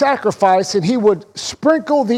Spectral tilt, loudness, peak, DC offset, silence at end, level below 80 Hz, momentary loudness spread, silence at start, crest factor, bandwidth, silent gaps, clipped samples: -5 dB/octave; -15 LUFS; -2 dBFS; under 0.1%; 0 s; -56 dBFS; 6 LU; 0 s; 12 dB; 12.5 kHz; none; under 0.1%